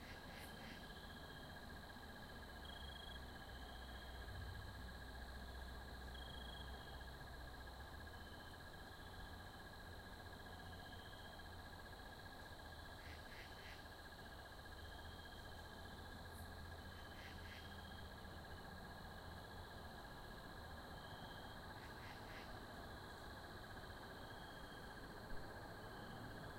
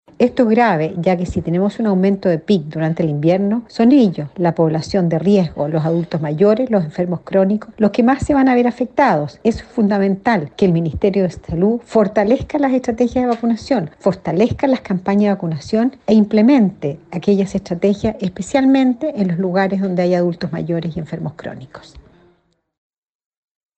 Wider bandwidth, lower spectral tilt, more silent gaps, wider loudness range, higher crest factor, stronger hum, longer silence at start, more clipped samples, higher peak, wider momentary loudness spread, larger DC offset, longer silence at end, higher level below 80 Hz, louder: first, 16.5 kHz vs 8.6 kHz; second, -4.5 dB/octave vs -8 dB/octave; neither; about the same, 2 LU vs 2 LU; about the same, 18 dB vs 14 dB; neither; second, 0 s vs 0.2 s; neither; second, -38 dBFS vs -2 dBFS; second, 3 LU vs 7 LU; neither; second, 0 s vs 1.75 s; second, -60 dBFS vs -44 dBFS; second, -55 LUFS vs -16 LUFS